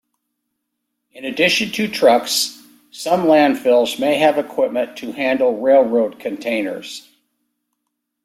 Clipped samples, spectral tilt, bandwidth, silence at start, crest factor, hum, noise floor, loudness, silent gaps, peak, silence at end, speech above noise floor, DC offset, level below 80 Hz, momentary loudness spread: under 0.1%; -3.5 dB/octave; 16 kHz; 1.15 s; 16 dB; none; -76 dBFS; -17 LUFS; none; -2 dBFS; 1.25 s; 59 dB; under 0.1%; -64 dBFS; 12 LU